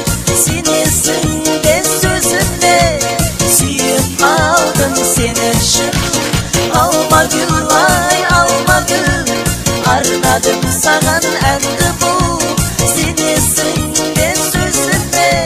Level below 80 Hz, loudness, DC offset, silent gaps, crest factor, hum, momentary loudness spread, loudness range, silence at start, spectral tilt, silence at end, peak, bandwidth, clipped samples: -28 dBFS; -11 LUFS; under 0.1%; none; 12 dB; none; 4 LU; 1 LU; 0 s; -3 dB/octave; 0 s; 0 dBFS; 16 kHz; under 0.1%